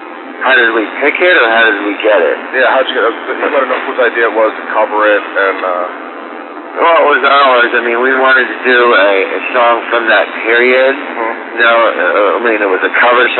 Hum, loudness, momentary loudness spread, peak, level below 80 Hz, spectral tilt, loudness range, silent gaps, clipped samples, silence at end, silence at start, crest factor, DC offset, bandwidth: none; -10 LUFS; 9 LU; -2 dBFS; -86 dBFS; -5.5 dB/octave; 3 LU; none; under 0.1%; 0 s; 0 s; 10 dB; under 0.1%; 4.3 kHz